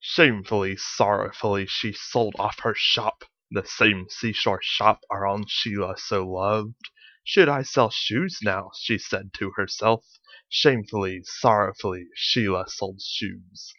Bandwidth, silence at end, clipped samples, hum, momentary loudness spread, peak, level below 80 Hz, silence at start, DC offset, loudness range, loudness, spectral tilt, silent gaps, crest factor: 7 kHz; 0.1 s; under 0.1%; none; 11 LU; 0 dBFS; -62 dBFS; 0 s; under 0.1%; 2 LU; -24 LUFS; -4.5 dB/octave; none; 24 dB